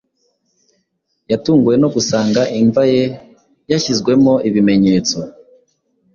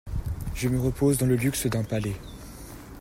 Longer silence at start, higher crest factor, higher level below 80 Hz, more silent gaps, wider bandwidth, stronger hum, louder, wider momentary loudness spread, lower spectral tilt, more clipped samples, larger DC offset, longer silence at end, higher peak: first, 1.3 s vs 0.05 s; about the same, 16 dB vs 16 dB; second, -50 dBFS vs -40 dBFS; neither; second, 7.4 kHz vs 16 kHz; neither; first, -14 LUFS vs -26 LUFS; second, 9 LU vs 19 LU; about the same, -5.5 dB/octave vs -6 dB/octave; neither; neither; first, 0.85 s vs 0 s; first, 0 dBFS vs -12 dBFS